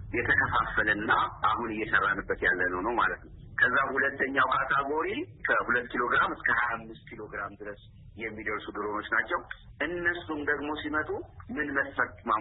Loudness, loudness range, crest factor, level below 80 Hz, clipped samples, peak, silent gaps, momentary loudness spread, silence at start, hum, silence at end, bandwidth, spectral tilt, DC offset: -28 LUFS; 6 LU; 18 dB; -52 dBFS; under 0.1%; -12 dBFS; none; 13 LU; 0 s; none; 0 s; 4.1 kHz; -8.5 dB/octave; under 0.1%